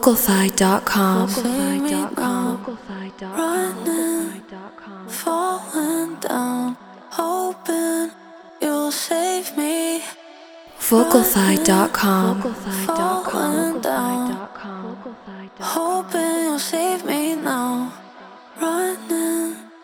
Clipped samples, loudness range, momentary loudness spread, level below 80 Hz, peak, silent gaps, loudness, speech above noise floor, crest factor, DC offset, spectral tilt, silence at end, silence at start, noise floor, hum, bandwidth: under 0.1%; 6 LU; 16 LU; -56 dBFS; 0 dBFS; none; -21 LUFS; 23 dB; 20 dB; under 0.1%; -4 dB/octave; 0.05 s; 0 s; -43 dBFS; none; over 20 kHz